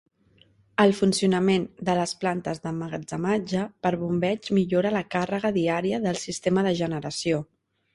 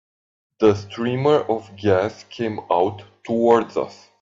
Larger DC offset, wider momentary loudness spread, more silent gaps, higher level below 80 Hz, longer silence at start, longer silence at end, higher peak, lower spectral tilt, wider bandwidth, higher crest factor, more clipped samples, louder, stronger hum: neither; about the same, 8 LU vs 10 LU; neither; about the same, -60 dBFS vs -60 dBFS; first, 0.8 s vs 0.6 s; first, 0.5 s vs 0.3 s; second, -6 dBFS vs -2 dBFS; second, -5.5 dB/octave vs -7 dB/octave; first, 11.5 kHz vs 7.6 kHz; about the same, 20 dB vs 18 dB; neither; second, -25 LUFS vs -21 LUFS; neither